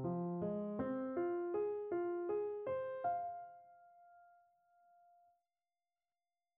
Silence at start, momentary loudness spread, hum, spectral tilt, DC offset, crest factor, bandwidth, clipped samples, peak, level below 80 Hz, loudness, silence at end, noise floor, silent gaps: 0 s; 6 LU; none; -9 dB/octave; under 0.1%; 16 dB; 3.4 kHz; under 0.1%; -28 dBFS; -78 dBFS; -41 LUFS; 2.3 s; under -90 dBFS; none